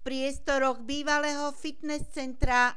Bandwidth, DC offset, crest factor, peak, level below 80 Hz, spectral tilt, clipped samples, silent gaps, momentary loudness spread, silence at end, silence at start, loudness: 11 kHz; 1%; 18 dB; -10 dBFS; -40 dBFS; -3.5 dB/octave; under 0.1%; none; 8 LU; 0.05 s; 0.05 s; -30 LUFS